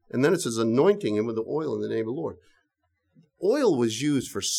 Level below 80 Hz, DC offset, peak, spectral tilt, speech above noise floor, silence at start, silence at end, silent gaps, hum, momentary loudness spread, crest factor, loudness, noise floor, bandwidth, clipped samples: -68 dBFS; under 0.1%; -8 dBFS; -4.5 dB/octave; 51 dB; 0.15 s; 0 s; none; none; 8 LU; 18 dB; -25 LUFS; -75 dBFS; 16 kHz; under 0.1%